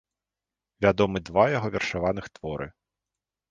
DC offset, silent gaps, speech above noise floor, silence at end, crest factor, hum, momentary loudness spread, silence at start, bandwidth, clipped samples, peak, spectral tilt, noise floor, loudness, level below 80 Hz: under 0.1%; none; 64 dB; 0.8 s; 22 dB; none; 13 LU; 0.8 s; 9 kHz; under 0.1%; -6 dBFS; -6 dB/octave; -89 dBFS; -26 LUFS; -50 dBFS